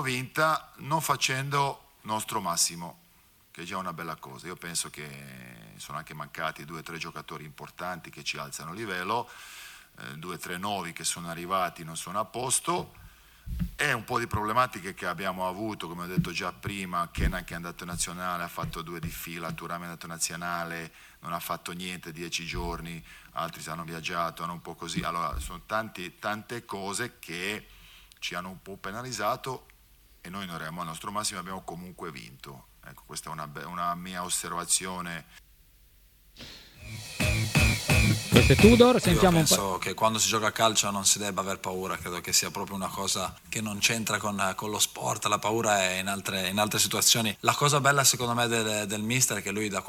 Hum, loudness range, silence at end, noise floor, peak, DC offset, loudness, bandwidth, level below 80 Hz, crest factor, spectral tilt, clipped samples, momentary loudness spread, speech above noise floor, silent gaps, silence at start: none; 14 LU; 0 s; -61 dBFS; -2 dBFS; under 0.1%; -28 LUFS; 19 kHz; -44 dBFS; 28 dB; -3.5 dB/octave; under 0.1%; 18 LU; 31 dB; none; 0 s